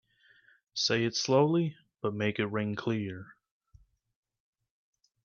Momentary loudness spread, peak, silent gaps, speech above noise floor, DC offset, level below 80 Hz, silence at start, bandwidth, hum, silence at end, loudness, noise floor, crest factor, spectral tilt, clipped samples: 13 LU; -14 dBFS; none; 34 dB; under 0.1%; -70 dBFS; 0.75 s; 7.2 kHz; none; 1.9 s; -30 LUFS; -64 dBFS; 20 dB; -5 dB/octave; under 0.1%